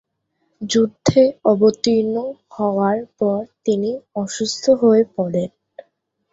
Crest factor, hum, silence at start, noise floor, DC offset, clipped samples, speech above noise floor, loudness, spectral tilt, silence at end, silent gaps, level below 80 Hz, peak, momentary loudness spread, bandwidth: 16 dB; none; 0.6 s; -70 dBFS; under 0.1%; under 0.1%; 52 dB; -18 LUFS; -5.5 dB/octave; 0.85 s; none; -56 dBFS; -2 dBFS; 10 LU; 8 kHz